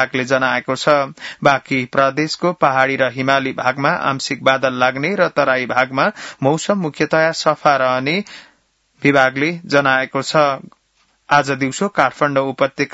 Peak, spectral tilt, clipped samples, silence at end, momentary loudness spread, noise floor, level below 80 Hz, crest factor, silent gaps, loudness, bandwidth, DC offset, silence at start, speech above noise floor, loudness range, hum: 0 dBFS; -4.5 dB/octave; under 0.1%; 0.05 s; 5 LU; -61 dBFS; -60 dBFS; 16 dB; none; -16 LUFS; 8 kHz; under 0.1%; 0 s; 44 dB; 1 LU; none